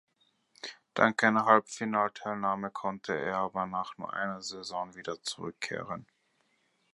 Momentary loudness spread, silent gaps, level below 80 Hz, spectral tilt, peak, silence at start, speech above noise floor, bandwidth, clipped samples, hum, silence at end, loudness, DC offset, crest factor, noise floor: 14 LU; none; -72 dBFS; -4 dB/octave; -6 dBFS; 0.65 s; 42 dB; 11.5 kHz; under 0.1%; none; 0.9 s; -31 LUFS; under 0.1%; 26 dB; -73 dBFS